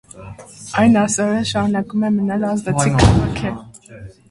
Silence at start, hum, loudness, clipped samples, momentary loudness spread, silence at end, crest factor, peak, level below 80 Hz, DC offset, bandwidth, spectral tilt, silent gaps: 0.15 s; none; -17 LUFS; under 0.1%; 22 LU; 0.2 s; 18 dB; 0 dBFS; -32 dBFS; under 0.1%; 11.5 kHz; -5.5 dB/octave; none